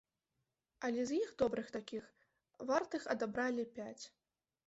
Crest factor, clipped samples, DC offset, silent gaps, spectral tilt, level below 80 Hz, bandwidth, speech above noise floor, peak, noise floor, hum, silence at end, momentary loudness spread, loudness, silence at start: 20 dB; under 0.1%; under 0.1%; none; -3.5 dB/octave; -74 dBFS; 8 kHz; 49 dB; -20 dBFS; -88 dBFS; none; 0.6 s; 12 LU; -40 LUFS; 0.8 s